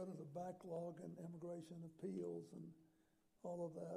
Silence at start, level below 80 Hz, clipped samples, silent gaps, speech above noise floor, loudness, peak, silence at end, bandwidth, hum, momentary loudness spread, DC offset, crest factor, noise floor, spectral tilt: 0 s; -88 dBFS; under 0.1%; none; 28 dB; -52 LUFS; -38 dBFS; 0 s; 14 kHz; none; 8 LU; under 0.1%; 14 dB; -79 dBFS; -8 dB/octave